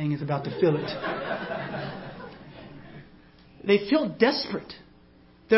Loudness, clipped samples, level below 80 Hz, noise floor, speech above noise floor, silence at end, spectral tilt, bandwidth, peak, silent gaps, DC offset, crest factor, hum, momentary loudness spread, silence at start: -27 LUFS; under 0.1%; -60 dBFS; -55 dBFS; 29 dB; 0 s; -9.5 dB/octave; 5.8 kHz; -6 dBFS; none; under 0.1%; 22 dB; none; 23 LU; 0 s